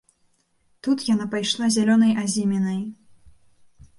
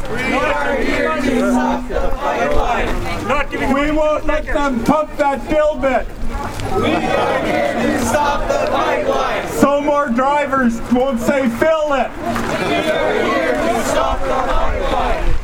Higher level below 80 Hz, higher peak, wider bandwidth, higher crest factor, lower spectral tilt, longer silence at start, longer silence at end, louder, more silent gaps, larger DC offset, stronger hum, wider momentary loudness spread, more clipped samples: second, -62 dBFS vs -26 dBFS; second, -8 dBFS vs 0 dBFS; second, 11.5 kHz vs 16.5 kHz; about the same, 16 dB vs 16 dB; about the same, -4.5 dB/octave vs -5 dB/octave; first, 0.85 s vs 0 s; first, 1.05 s vs 0 s; second, -22 LUFS vs -17 LUFS; neither; neither; neither; first, 11 LU vs 4 LU; neither